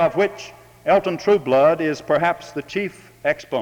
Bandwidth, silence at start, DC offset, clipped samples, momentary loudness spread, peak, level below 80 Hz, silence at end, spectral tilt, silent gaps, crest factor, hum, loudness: 19 kHz; 0 s; under 0.1%; under 0.1%; 12 LU; -4 dBFS; -56 dBFS; 0 s; -5.5 dB/octave; none; 16 dB; none; -20 LUFS